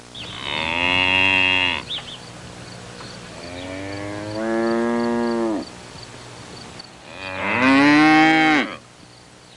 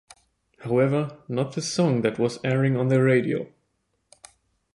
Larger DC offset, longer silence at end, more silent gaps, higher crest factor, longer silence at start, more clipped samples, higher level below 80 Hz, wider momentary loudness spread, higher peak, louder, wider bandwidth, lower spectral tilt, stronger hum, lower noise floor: neither; second, 0.8 s vs 1.25 s; neither; about the same, 16 dB vs 18 dB; second, 0.05 s vs 0.6 s; neither; first, -54 dBFS vs -62 dBFS; first, 24 LU vs 9 LU; about the same, -6 dBFS vs -8 dBFS; first, -18 LUFS vs -24 LUFS; about the same, 11.5 kHz vs 11.5 kHz; second, -4.5 dB/octave vs -6.5 dB/octave; neither; second, -45 dBFS vs -73 dBFS